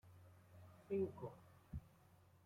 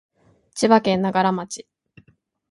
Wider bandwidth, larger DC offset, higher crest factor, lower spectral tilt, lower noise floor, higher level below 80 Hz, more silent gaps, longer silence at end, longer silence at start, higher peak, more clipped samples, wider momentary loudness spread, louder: first, 16 kHz vs 11.5 kHz; neither; about the same, 18 dB vs 20 dB; first, -9 dB/octave vs -5 dB/octave; first, -70 dBFS vs -60 dBFS; second, -68 dBFS vs -62 dBFS; neither; second, 0.6 s vs 0.9 s; second, 0.05 s vs 0.55 s; second, -32 dBFS vs -2 dBFS; neither; first, 22 LU vs 18 LU; second, -48 LUFS vs -19 LUFS